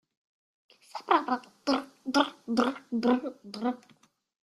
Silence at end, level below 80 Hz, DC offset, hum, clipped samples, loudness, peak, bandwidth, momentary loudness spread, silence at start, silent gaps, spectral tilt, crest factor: 0.65 s; -72 dBFS; under 0.1%; none; under 0.1%; -29 LUFS; -8 dBFS; 12.5 kHz; 12 LU; 0.95 s; none; -4 dB/octave; 22 dB